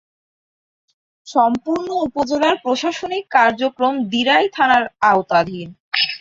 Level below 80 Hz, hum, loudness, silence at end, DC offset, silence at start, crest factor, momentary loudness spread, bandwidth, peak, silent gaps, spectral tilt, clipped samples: -58 dBFS; none; -17 LUFS; 0.05 s; under 0.1%; 1.25 s; 16 dB; 7 LU; 7.8 kHz; -2 dBFS; 5.80-5.91 s; -4 dB/octave; under 0.1%